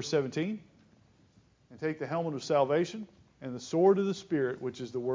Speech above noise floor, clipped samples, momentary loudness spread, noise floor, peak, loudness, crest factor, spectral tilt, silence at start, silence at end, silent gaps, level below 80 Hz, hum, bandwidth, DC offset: 34 dB; under 0.1%; 17 LU; -64 dBFS; -14 dBFS; -31 LUFS; 18 dB; -6 dB/octave; 0 s; 0 s; none; -72 dBFS; none; 7.6 kHz; under 0.1%